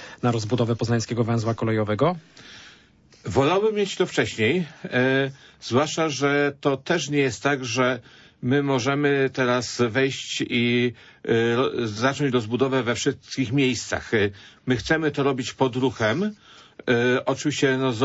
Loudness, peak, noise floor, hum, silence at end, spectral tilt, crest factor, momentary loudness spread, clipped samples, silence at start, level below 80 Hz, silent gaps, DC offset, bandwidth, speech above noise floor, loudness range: -23 LUFS; -8 dBFS; -55 dBFS; none; 0 s; -5 dB/octave; 16 dB; 6 LU; under 0.1%; 0 s; -56 dBFS; none; under 0.1%; 8 kHz; 32 dB; 2 LU